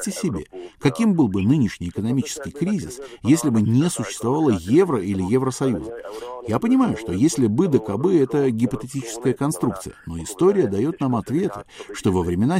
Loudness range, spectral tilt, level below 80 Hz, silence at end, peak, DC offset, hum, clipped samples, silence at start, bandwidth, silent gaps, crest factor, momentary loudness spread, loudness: 2 LU; -6.5 dB/octave; -50 dBFS; 0 s; -4 dBFS; under 0.1%; none; under 0.1%; 0 s; 16 kHz; none; 16 dB; 13 LU; -21 LUFS